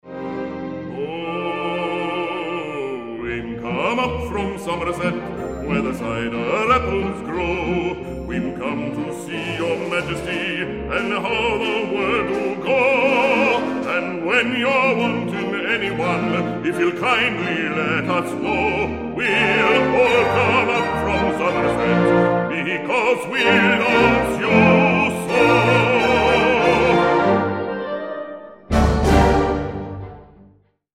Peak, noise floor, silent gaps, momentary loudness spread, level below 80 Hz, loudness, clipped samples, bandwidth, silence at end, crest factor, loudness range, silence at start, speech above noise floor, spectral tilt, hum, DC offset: -2 dBFS; -54 dBFS; none; 12 LU; -36 dBFS; -19 LUFS; under 0.1%; 15 kHz; 0.7 s; 16 dB; 8 LU; 0.05 s; 34 dB; -6 dB/octave; none; 0.1%